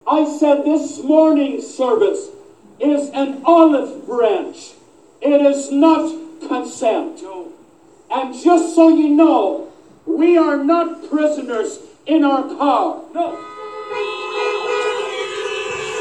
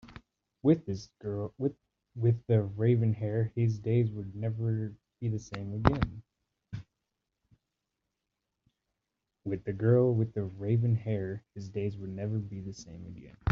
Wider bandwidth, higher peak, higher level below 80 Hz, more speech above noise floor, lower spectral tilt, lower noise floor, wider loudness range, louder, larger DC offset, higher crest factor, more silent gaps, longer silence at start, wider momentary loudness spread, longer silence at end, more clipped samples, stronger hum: first, 10 kHz vs 6.8 kHz; first, 0 dBFS vs -4 dBFS; second, -68 dBFS vs -54 dBFS; second, 33 dB vs 56 dB; second, -3.5 dB/octave vs -9 dB/octave; second, -48 dBFS vs -86 dBFS; about the same, 5 LU vs 7 LU; first, -16 LUFS vs -31 LUFS; first, 0.1% vs under 0.1%; second, 16 dB vs 28 dB; neither; about the same, 0.05 s vs 0.05 s; about the same, 15 LU vs 17 LU; about the same, 0 s vs 0 s; neither; neither